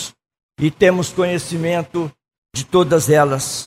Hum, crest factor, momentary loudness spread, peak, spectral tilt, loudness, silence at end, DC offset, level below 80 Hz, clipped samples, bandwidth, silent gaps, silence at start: none; 18 dB; 14 LU; 0 dBFS; -5 dB/octave; -17 LUFS; 0 s; under 0.1%; -50 dBFS; under 0.1%; 16 kHz; 0.43-0.49 s, 2.38-2.42 s; 0 s